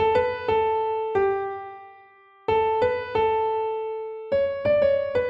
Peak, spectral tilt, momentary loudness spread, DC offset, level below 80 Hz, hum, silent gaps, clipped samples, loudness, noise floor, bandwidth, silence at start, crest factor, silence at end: -10 dBFS; -7 dB/octave; 11 LU; under 0.1%; -54 dBFS; none; none; under 0.1%; -24 LUFS; -52 dBFS; 5.6 kHz; 0 s; 14 dB; 0 s